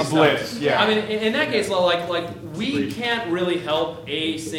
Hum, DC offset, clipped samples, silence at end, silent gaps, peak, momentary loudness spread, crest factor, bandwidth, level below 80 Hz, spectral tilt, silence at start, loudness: none; under 0.1%; under 0.1%; 0 s; none; -2 dBFS; 8 LU; 20 dB; 16.5 kHz; -58 dBFS; -4.5 dB/octave; 0 s; -21 LUFS